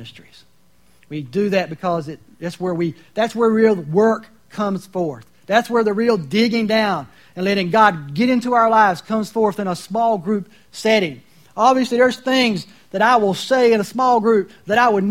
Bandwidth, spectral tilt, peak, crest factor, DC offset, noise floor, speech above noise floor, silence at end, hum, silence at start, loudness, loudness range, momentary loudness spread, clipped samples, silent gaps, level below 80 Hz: 16 kHz; -5.5 dB/octave; 0 dBFS; 18 dB; 0.2%; -57 dBFS; 40 dB; 0 s; none; 0 s; -18 LUFS; 3 LU; 12 LU; under 0.1%; none; -60 dBFS